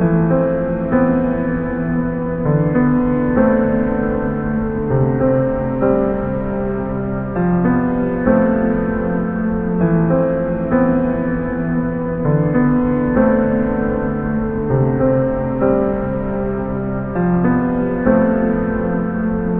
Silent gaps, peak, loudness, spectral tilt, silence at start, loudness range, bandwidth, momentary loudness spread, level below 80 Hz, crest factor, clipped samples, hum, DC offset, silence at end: none; 0 dBFS; -17 LUFS; -13.5 dB/octave; 0 s; 1 LU; 3.5 kHz; 6 LU; -32 dBFS; 16 dB; under 0.1%; none; 0.2%; 0 s